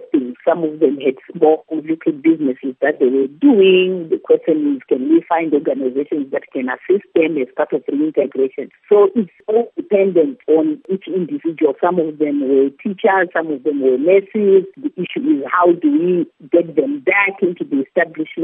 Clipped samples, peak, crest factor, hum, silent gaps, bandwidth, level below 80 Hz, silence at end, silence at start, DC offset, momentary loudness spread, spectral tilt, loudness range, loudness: under 0.1%; 0 dBFS; 14 dB; none; none; 3.7 kHz; -76 dBFS; 0 s; 0 s; under 0.1%; 8 LU; -10.5 dB/octave; 3 LU; -16 LUFS